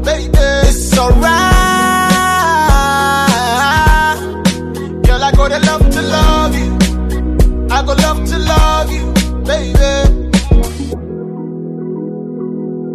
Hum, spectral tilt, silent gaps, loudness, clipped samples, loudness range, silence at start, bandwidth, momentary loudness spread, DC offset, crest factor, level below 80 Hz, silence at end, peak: none; -5 dB/octave; none; -12 LUFS; under 0.1%; 5 LU; 0 s; 14 kHz; 12 LU; under 0.1%; 12 dB; -14 dBFS; 0 s; 0 dBFS